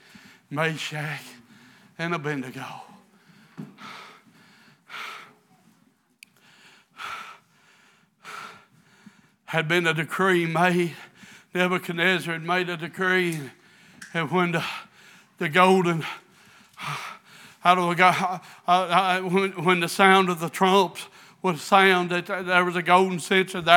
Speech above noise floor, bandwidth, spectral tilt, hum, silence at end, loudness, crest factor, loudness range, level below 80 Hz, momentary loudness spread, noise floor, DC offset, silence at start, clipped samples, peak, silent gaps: 41 dB; 18.5 kHz; -5 dB/octave; none; 0 s; -23 LUFS; 26 dB; 22 LU; -78 dBFS; 22 LU; -63 dBFS; under 0.1%; 0.5 s; under 0.1%; 0 dBFS; none